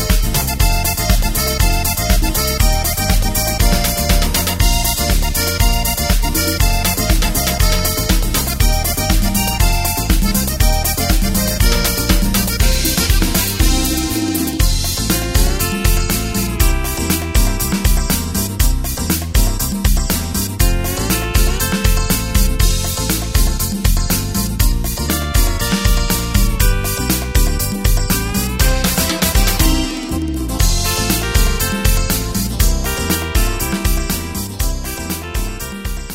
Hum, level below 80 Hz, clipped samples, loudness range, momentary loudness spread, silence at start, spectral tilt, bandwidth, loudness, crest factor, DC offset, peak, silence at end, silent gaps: none; -18 dBFS; under 0.1%; 2 LU; 4 LU; 0 s; -3.5 dB/octave; 16.5 kHz; -16 LUFS; 14 dB; under 0.1%; 0 dBFS; 0 s; none